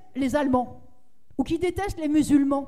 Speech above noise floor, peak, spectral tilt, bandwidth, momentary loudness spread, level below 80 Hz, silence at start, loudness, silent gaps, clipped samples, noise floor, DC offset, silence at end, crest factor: 37 dB; -10 dBFS; -6 dB/octave; 14 kHz; 11 LU; -46 dBFS; 0.15 s; -24 LUFS; none; under 0.1%; -61 dBFS; 0.7%; 0 s; 16 dB